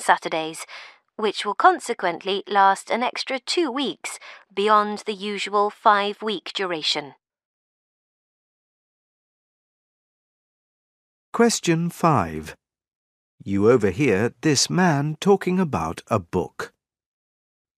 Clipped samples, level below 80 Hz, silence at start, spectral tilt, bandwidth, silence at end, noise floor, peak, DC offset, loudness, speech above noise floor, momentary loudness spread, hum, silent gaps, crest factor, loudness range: under 0.1%; -58 dBFS; 0 s; -4.5 dB/octave; 15.5 kHz; 1.1 s; under -90 dBFS; -2 dBFS; under 0.1%; -22 LUFS; over 68 dB; 14 LU; none; 7.45-11.32 s, 12.95-13.38 s; 22 dB; 7 LU